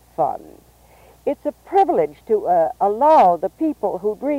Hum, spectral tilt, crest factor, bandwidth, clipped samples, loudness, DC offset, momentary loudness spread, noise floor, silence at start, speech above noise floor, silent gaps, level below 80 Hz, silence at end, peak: none; -7 dB/octave; 14 dB; 16 kHz; under 0.1%; -19 LUFS; under 0.1%; 12 LU; -49 dBFS; 0.2 s; 31 dB; none; -56 dBFS; 0 s; -6 dBFS